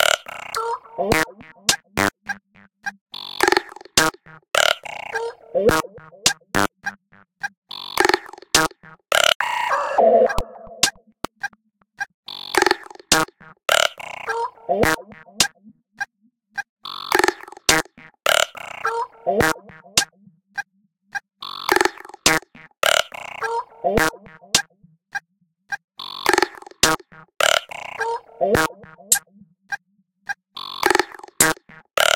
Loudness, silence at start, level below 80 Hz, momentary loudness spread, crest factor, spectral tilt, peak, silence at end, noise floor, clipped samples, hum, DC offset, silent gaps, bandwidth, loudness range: -20 LUFS; 0 s; -48 dBFS; 15 LU; 22 dB; -1.5 dB/octave; 0 dBFS; 0 s; -67 dBFS; under 0.1%; none; under 0.1%; 3.01-3.06 s, 7.57-7.62 s, 9.35-9.40 s, 12.14-12.23 s, 16.69-16.77 s, 25.84-25.88 s; 17 kHz; 3 LU